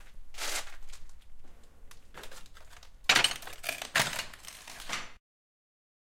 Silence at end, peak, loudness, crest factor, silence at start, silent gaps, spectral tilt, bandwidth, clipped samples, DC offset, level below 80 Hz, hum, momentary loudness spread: 1 s; -6 dBFS; -30 LUFS; 28 dB; 0 s; none; -0.5 dB/octave; 17 kHz; under 0.1%; under 0.1%; -52 dBFS; none; 25 LU